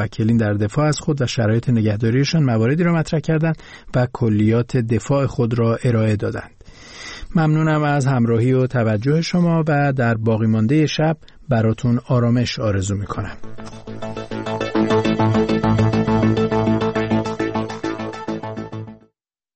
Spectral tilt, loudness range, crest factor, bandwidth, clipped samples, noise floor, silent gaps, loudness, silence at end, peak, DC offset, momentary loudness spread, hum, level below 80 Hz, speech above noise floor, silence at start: -7 dB/octave; 4 LU; 12 dB; 8.6 kHz; under 0.1%; -67 dBFS; none; -19 LUFS; 0.6 s; -6 dBFS; 0.2%; 12 LU; none; -42 dBFS; 49 dB; 0 s